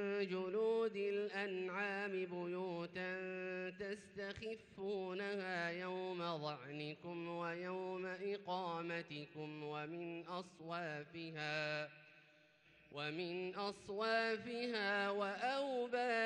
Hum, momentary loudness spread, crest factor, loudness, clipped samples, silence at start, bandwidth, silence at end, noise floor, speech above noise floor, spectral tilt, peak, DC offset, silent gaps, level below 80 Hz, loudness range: none; 10 LU; 16 dB; -43 LUFS; under 0.1%; 0 s; 10 kHz; 0 s; -70 dBFS; 26 dB; -5.5 dB/octave; -28 dBFS; under 0.1%; none; -82 dBFS; 5 LU